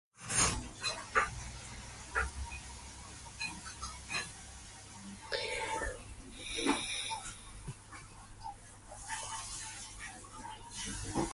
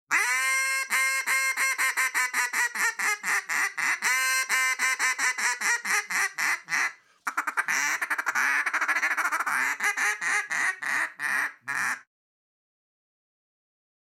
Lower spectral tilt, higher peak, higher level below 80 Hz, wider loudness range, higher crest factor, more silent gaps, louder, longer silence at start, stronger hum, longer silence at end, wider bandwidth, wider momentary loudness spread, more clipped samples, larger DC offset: first, -2 dB/octave vs 2 dB/octave; second, -14 dBFS vs -10 dBFS; first, -52 dBFS vs under -90 dBFS; first, 7 LU vs 4 LU; first, 26 dB vs 18 dB; neither; second, -38 LUFS vs -25 LUFS; about the same, 0.15 s vs 0.1 s; neither; second, 0 s vs 2.05 s; second, 12 kHz vs 18 kHz; first, 16 LU vs 5 LU; neither; neither